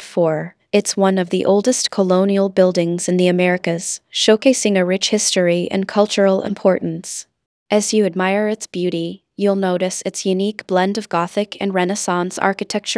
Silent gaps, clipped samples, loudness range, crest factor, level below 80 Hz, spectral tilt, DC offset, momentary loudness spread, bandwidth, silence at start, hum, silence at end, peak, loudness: 7.46-7.66 s; under 0.1%; 4 LU; 18 dB; -68 dBFS; -4.5 dB/octave; under 0.1%; 7 LU; 11 kHz; 0 s; none; 0 s; 0 dBFS; -17 LUFS